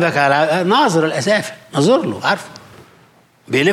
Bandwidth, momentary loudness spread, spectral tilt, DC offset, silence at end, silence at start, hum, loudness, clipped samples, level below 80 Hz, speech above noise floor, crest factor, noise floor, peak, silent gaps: 15.5 kHz; 8 LU; -5 dB/octave; under 0.1%; 0 s; 0 s; none; -16 LUFS; under 0.1%; -64 dBFS; 35 dB; 14 dB; -51 dBFS; -2 dBFS; none